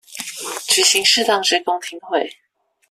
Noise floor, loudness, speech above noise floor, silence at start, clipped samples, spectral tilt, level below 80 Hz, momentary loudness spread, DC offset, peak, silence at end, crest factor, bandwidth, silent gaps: -66 dBFS; -16 LUFS; 48 dB; 0.1 s; under 0.1%; 0.5 dB/octave; -68 dBFS; 15 LU; under 0.1%; 0 dBFS; 0.55 s; 20 dB; 16 kHz; none